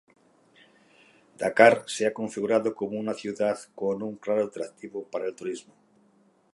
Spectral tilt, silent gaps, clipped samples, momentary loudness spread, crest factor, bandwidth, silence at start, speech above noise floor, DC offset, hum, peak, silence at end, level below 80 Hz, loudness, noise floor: -4.5 dB/octave; none; under 0.1%; 17 LU; 26 dB; 11.5 kHz; 1.4 s; 37 dB; under 0.1%; none; -2 dBFS; 0.95 s; -74 dBFS; -26 LUFS; -63 dBFS